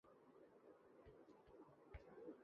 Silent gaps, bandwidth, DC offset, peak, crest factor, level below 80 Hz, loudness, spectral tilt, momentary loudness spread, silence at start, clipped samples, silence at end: none; 5.6 kHz; under 0.1%; -46 dBFS; 20 dB; -72 dBFS; -66 LUFS; -7 dB/octave; 8 LU; 0.05 s; under 0.1%; 0 s